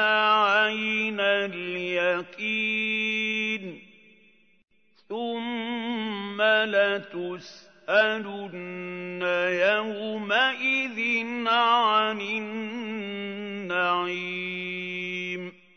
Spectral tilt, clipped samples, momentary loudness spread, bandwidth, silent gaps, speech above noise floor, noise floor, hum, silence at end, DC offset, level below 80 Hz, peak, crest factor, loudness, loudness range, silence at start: -4.5 dB/octave; under 0.1%; 14 LU; 6.6 kHz; none; 35 dB; -61 dBFS; none; 0.25 s; under 0.1%; -80 dBFS; -8 dBFS; 20 dB; -25 LUFS; 6 LU; 0 s